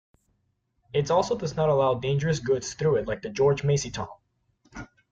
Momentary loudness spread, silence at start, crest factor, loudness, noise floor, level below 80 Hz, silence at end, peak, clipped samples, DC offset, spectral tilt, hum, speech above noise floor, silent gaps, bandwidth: 17 LU; 0.95 s; 16 dB; -26 LUFS; -73 dBFS; -54 dBFS; 0.25 s; -10 dBFS; under 0.1%; under 0.1%; -5.5 dB/octave; none; 48 dB; none; 8.8 kHz